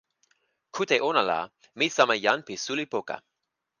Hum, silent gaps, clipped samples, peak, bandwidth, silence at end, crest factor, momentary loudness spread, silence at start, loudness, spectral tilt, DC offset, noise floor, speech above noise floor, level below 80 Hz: none; none; under 0.1%; -6 dBFS; 10 kHz; 0.6 s; 22 dB; 16 LU; 0.75 s; -26 LUFS; -2.5 dB/octave; under 0.1%; -83 dBFS; 57 dB; -76 dBFS